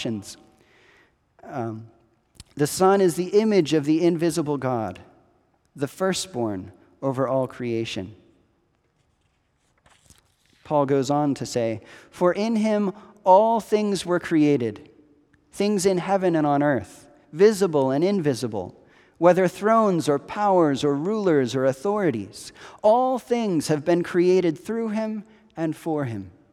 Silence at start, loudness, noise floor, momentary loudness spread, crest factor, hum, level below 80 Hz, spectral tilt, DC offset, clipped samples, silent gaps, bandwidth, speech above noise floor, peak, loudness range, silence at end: 0 s; -22 LUFS; -68 dBFS; 14 LU; 20 dB; none; -64 dBFS; -6 dB/octave; under 0.1%; under 0.1%; none; 15.5 kHz; 46 dB; -4 dBFS; 7 LU; 0.25 s